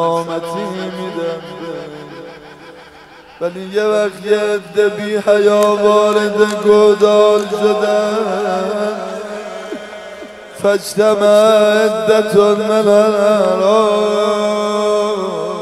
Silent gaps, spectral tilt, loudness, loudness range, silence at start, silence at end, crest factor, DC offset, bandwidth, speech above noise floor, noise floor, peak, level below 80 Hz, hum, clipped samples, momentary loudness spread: none; -4.5 dB/octave; -13 LUFS; 10 LU; 0 s; 0 s; 14 dB; under 0.1%; 13.5 kHz; 26 dB; -39 dBFS; 0 dBFS; -58 dBFS; none; under 0.1%; 17 LU